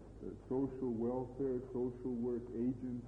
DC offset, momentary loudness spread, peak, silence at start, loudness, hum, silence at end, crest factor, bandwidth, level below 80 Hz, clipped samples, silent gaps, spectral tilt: under 0.1%; 3 LU; -28 dBFS; 0 s; -40 LUFS; none; 0 s; 12 dB; 4 kHz; -60 dBFS; under 0.1%; none; -10.5 dB/octave